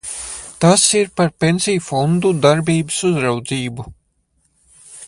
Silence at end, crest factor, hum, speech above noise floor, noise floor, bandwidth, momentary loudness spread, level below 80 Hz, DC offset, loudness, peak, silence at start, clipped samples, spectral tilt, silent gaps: 0 s; 16 dB; none; 48 dB; -64 dBFS; 11.5 kHz; 15 LU; -50 dBFS; under 0.1%; -16 LUFS; 0 dBFS; 0.05 s; under 0.1%; -4.5 dB/octave; none